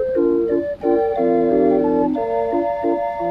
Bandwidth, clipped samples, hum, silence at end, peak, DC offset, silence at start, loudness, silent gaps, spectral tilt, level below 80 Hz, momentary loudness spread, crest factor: 5.2 kHz; under 0.1%; none; 0 s; -4 dBFS; under 0.1%; 0 s; -18 LUFS; none; -9.5 dB/octave; -48 dBFS; 5 LU; 14 dB